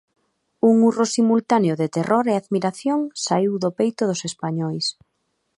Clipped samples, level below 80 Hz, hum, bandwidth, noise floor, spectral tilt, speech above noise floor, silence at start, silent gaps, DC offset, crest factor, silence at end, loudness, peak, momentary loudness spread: under 0.1%; -68 dBFS; none; 11.5 kHz; -72 dBFS; -5.5 dB/octave; 52 dB; 0.65 s; none; under 0.1%; 16 dB; 0.65 s; -21 LUFS; -4 dBFS; 8 LU